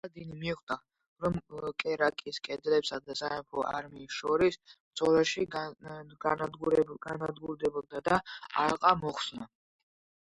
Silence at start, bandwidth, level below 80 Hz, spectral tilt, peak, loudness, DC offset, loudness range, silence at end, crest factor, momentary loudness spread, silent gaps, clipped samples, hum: 0.05 s; 11 kHz; -62 dBFS; -5 dB/octave; -8 dBFS; -32 LUFS; under 0.1%; 3 LU; 0.85 s; 24 dB; 12 LU; 0.63-0.67 s, 1.07-1.16 s, 4.80-4.91 s; under 0.1%; none